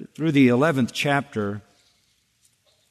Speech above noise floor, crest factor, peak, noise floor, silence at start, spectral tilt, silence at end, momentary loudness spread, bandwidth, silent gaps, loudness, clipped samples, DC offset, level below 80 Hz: 45 dB; 16 dB; -6 dBFS; -66 dBFS; 0 s; -6 dB/octave; 1.3 s; 12 LU; 13.5 kHz; none; -21 LUFS; under 0.1%; under 0.1%; -64 dBFS